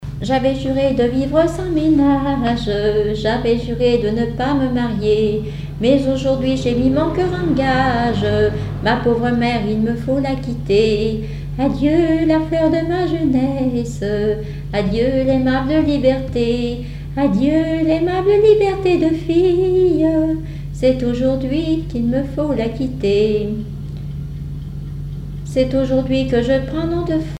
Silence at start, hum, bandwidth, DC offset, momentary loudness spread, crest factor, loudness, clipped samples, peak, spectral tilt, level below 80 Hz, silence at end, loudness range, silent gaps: 0 s; none; 11 kHz; under 0.1%; 9 LU; 14 dB; -17 LUFS; under 0.1%; -2 dBFS; -7.5 dB/octave; -32 dBFS; 0 s; 5 LU; none